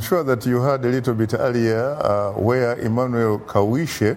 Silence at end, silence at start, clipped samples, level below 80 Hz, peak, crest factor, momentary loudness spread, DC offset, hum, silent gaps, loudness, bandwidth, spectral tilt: 0 s; 0 s; under 0.1%; -52 dBFS; -4 dBFS; 16 dB; 2 LU; under 0.1%; none; none; -20 LUFS; 16.5 kHz; -7 dB/octave